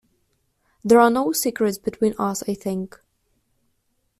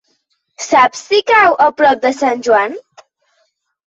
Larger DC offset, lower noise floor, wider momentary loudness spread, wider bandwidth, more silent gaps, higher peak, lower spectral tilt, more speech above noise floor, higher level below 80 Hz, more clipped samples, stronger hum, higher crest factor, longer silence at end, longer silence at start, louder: neither; first, -70 dBFS vs -64 dBFS; first, 14 LU vs 10 LU; first, 15.5 kHz vs 8 kHz; neither; second, -4 dBFS vs 0 dBFS; first, -4.5 dB/octave vs -2 dB/octave; about the same, 50 dB vs 52 dB; about the same, -60 dBFS vs -58 dBFS; neither; neither; first, 20 dB vs 14 dB; first, 1.3 s vs 1.05 s; first, 0.85 s vs 0.6 s; second, -21 LUFS vs -12 LUFS